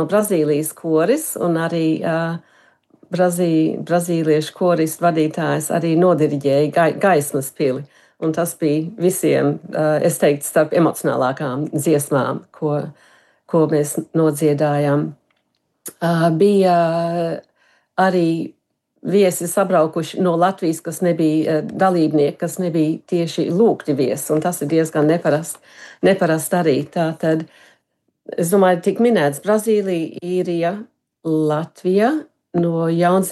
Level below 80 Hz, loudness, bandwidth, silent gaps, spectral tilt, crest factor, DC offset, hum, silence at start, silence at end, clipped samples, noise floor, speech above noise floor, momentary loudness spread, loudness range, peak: -72 dBFS; -18 LUFS; 13 kHz; none; -6 dB/octave; 14 dB; under 0.1%; none; 0 s; 0 s; under 0.1%; -69 dBFS; 52 dB; 8 LU; 2 LU; -4 dBFS